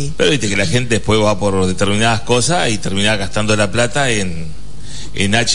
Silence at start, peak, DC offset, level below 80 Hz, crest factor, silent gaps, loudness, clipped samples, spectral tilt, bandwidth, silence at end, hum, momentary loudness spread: 0 s; 0 dBFS; 10%; -36 dBFS; 14 dB; none; -15 LUFS; under 0.1%; -4 dB/octave; 11 kHz; 0 s; none; 14 LU